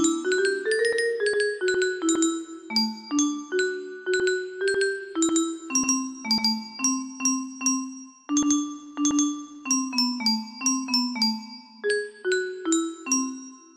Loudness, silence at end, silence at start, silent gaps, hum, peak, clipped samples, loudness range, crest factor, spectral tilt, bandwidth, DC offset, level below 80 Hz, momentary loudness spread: -25 LUFS; 0.1 s; 0 s; none; none; -10 dBFS; under 0.1%; 1 LU; 16 dB; -1.5 dB/octave; 15 kHz; under 0.1%; -68 dBFS; 5 LU